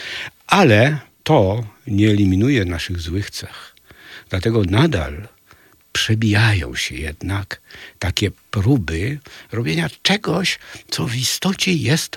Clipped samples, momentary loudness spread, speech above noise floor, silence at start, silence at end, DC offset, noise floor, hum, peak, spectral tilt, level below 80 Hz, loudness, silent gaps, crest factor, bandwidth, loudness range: under 0.1%; 14 LU; 33 dB; 0 s; 0 s; under 0.1%; -51 dBFS; none; 0 dBFS; -5 dB/octave; -42 dBFS; -18 LUFS; none; 18 dB; 17 kHz; 5 LU